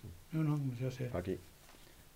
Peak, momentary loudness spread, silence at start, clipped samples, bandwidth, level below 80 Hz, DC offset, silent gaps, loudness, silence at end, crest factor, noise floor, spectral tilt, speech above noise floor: -24 dBFS; 23 LU; 0.05 s; under 0.1%; 16 kHz; -62 dBFS; under 0.1%; none; -39 LUFS; 0.05 s; 16 dB; -58 dBFS; -8 dB/octave; 21 dB